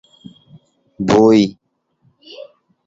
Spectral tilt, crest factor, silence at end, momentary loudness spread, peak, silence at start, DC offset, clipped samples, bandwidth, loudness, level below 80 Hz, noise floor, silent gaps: -6.5 dB/octave; 18 dB; 0.45 s; 26 LU; -2 dBFS; 1 s; under 0.1%; under 0.1%; 7.8 kHz; -13 LUFS; -52 dBFS; -60 dBFS; none